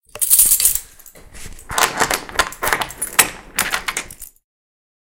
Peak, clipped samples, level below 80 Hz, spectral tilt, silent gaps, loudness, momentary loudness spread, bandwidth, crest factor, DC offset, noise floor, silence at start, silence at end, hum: 0 dBFS; under 0.1%; -40 dBFS; 0 dB/octave; none; -16 LUFS; 15 LU; over 20 kHz; 20 dB; under 0.1%; -42 dBFS; 0.15 s; 0.8 s; none